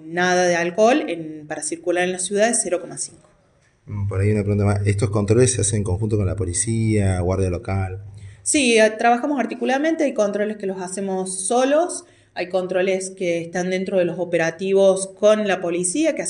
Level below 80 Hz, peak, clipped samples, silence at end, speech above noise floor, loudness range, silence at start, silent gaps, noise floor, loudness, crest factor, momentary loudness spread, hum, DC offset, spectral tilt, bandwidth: -46 dBFS; -4 dBFS; under 0.1%; 0 s; 39 dB; 3 LU; 0 s; none; -59 dBFS; -20 LUFS; 16 dB; 11 LU; none; under 0.1%; -5 dB/octave; 11.5 kHz